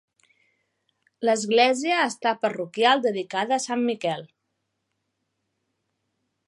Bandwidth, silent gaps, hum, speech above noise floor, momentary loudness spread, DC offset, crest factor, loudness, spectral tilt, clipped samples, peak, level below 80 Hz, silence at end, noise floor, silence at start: 11.5 kHz; none; none; 55 dB; 8 LU; under 0.1%; 22 dB; -23 LUFS; -3 dB/octave; under 0.1%; -4 dBFS; -82 dBFS; 2.2 s; -78 dBFS; 1.2 s